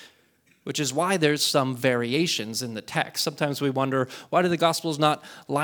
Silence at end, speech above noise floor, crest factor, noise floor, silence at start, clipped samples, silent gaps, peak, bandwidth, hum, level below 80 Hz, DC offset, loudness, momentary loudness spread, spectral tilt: 0 s; 38 dB; 20 dB; -63 dBFS; 0 s; under 0.1%; none; -6 dBFS; over 20 kHz; none; -68 dBFS; under 0.1%; -25 LUFS; 8 LU; -4 dB/octave